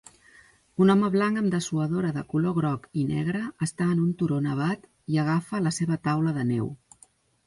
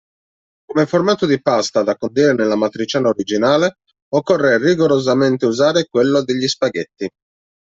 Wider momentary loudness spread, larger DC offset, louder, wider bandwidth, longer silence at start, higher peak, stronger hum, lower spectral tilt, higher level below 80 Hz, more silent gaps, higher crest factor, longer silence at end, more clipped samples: about the same, 8 LU vs 7 LU; neither; second, -26 LUFS vs -16 LUFS; first, 11.5 kHz vs 7.8 kHz; about the same, 0.8 s vs 0.7 s; second, -8 dBFS vs -2 dBFS; neither; first, -7 dB/octave vs -5 dB/octave; about the same, -60 dBFS vs -58 dBFS; second, none vs 4.02-4.11 s; about the same, 18 dB vs 14 dB; about the same, 0.7 s vs 0.65 s; neither